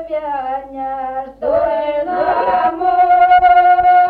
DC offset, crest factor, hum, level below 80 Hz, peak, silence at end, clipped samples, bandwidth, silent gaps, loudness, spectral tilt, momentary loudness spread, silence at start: under 0.1%; 12 dB; none; -44 dBFS; -2 dBFS; 0 s; under 0.1%; 4.6 kHz; none; -14 LUFS; -6 dB/octave; 14 LU; 0 s